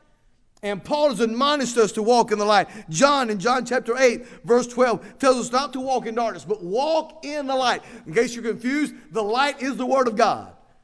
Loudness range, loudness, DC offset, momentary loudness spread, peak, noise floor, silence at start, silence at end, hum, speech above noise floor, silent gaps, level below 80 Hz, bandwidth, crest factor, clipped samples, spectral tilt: 4 LU; -22 LUFS; under 0.1%; 9 LU; -2 dBFS; -58 dBFS; 0.65 s; 0.35 s; none; 37 dB; none; -58 dBFS; 11 kHz; 20 dB; under 0.1%; -3.5 dB/octave